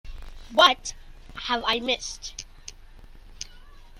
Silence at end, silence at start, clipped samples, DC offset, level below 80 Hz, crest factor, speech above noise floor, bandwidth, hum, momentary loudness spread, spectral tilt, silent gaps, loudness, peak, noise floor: 0 s; 0.05 s; under 0.1%; under 0.1%; -44 dBFS; 26 dB; 22 dB; 16 kHz; none; 26 LU; -1.5 dB/octave; none; -23 LUFS; -2 dBFS; -46 dBFS